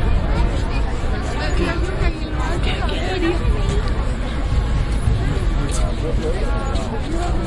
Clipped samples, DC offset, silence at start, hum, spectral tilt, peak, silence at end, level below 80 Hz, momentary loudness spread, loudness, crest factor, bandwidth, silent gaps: under 0.1%; under 0.1%; 0 s; none; -6 dB/octave; -4 dBFS; 0 s; -20 dBFS; 3 LU; -22 LUFS; 14 dB; 11.5 kHz; none